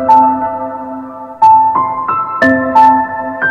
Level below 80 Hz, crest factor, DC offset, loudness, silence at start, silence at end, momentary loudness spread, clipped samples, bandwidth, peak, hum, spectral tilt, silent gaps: -50 dBFS; 10 dB; under 0.1%; -10 LUFS; 0 s; 0 s; 16 LU; under 0.1%; 6.6 kHz; 0 dBFS; none; -6.5 dB/octave; none